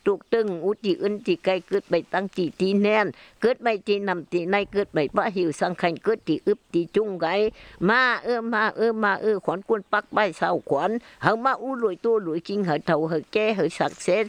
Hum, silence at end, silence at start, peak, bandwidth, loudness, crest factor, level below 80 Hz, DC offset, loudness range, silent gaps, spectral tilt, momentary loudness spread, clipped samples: none; 0 s; 0.05 s; -4 dBFS; 10.5 kHz; -24 LUFS; 20 dB; -60 dBFS; under 0.1%; 2 LU; none; -6 dB/octave; 5 LU; under 0.1%